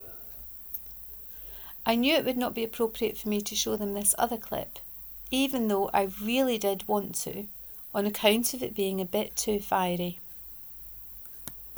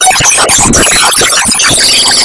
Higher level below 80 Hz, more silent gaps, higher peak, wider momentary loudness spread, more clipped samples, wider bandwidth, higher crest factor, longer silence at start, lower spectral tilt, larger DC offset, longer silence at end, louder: second, -56 dBFS vs -28 dBFS; neither; second, -8 dBFS vs 0 dBFS; first, 13 LU vs 1 LU; second, under 0.1% vs 3%; first, over 20 kHz vs 12 kHz; first, 22 dB vs 6 dB; about the same, 0 s vs 0 s; first, -3 dB/octave vs -0.5 dB/octave; neither; about the same, 0 s vs 0 s; second, -29 LUFS vs -4 LUFS